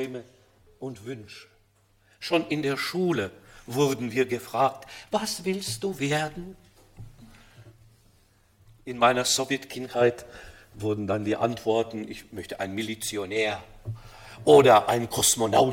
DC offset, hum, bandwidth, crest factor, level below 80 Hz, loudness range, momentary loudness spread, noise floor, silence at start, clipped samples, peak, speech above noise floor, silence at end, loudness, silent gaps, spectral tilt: under 0.1%; none; 16.5 kHz; 24 dB; -56 dBFS; 8 LU; 20 LU; -63 dBFS; 0 s; under 0.1%; -4 dBFS; 38 dB; 0 s; -25 LUFS; none; -4 dB/octave